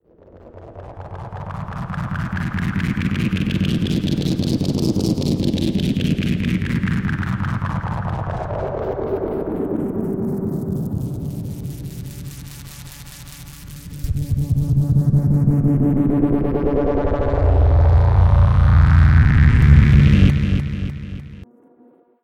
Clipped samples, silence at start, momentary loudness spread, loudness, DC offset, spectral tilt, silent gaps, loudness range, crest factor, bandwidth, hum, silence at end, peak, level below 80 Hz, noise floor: under 0.1%; 0.45 s; 21 LU; -18 LUFS; under 0.1%; -8 dB/octave; none; 12 LU; 18 dB; 16 kHz; none; 0.8 s; 0 dBFS; -24 dBFS; -52 dBFS